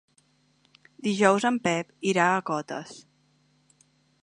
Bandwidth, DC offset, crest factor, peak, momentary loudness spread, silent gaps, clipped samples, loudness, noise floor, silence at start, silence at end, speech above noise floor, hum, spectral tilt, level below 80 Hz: 10.5 kHz; under 0.1%; 24 dB; -4 dBFS; 15 LU; none; under 0.1%; -25 LUFS; -66 dBFS; 1 s; 1.25 s; 41 dB; none; -4.5 dB/octave; -74 dBFS